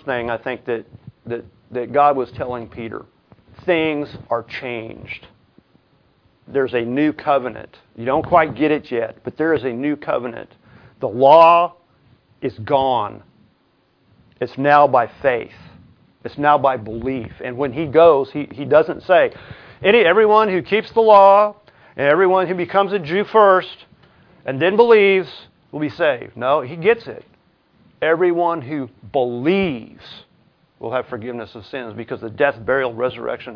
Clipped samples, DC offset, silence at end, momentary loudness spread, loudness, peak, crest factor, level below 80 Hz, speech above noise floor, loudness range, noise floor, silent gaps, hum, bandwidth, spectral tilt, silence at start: under 0.1%; under 0.1%; 0 s; 18 LU; -17 LUFS; 0 dBFS; 18 dB; -54 dBFS; 43 dB; 10 LU; -61 dBFS; none; none; 5.4 kHz; -8 dB/octave; 0.05 s